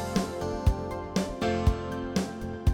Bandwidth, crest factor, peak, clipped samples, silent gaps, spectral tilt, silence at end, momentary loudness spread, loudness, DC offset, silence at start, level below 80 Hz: 18 kHz; 18 dB; -10 dBFS; under 0.1%; none; -6.5 dB/octave; 0 s; 6 LU; -30 LUFS; under 0.1%; 0 s; -36 dBFS